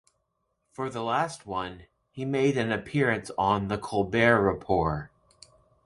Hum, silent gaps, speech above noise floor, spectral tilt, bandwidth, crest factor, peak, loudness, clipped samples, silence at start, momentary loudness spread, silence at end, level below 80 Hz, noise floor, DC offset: none; none; 50 dB; -6 dB/octave; 11.5 kHz; 22 dB; -6 dBFS; -27 LUFS; under 0.1%; 0.8 s; 14 LU; 0.8 s; -50 dBFS; -77 dBFS; under 0.1%